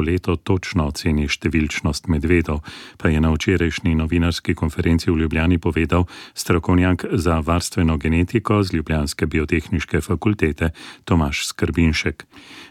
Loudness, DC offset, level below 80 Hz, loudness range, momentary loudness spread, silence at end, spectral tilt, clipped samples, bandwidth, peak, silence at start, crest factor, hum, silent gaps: -20 LUFS; under 0.1%; -30 dBFS; 2 LU; 5 LU; 0.05 s; -6 dB/octave; under 0.1%; 15 kHz; -4 dBFS; 0 s; 16 dB; none; none